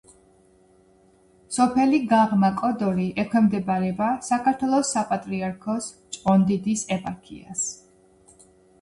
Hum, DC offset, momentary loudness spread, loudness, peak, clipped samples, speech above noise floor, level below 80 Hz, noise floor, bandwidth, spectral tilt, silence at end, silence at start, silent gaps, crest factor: none; under 0.1%; 11 LU; -23 LUFS; -8 dBFS; under 0.1%; 35 dB; -58 dBFS; -57 dBFS; 11.5 kHz; -5.5 dB/octave; 1.05 s; 1.5 s; none; 16 dB